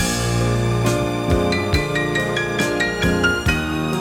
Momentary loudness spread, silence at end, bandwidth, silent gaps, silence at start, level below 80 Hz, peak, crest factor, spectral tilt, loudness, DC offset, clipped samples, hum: 3 LU; 0 s; 16.5 kHz; none; 0 s; -30 dBFS; -4 dBFS; 14 dB; -5 dB/octave; -19 LUFS; under 0.1%; under 0.1%; none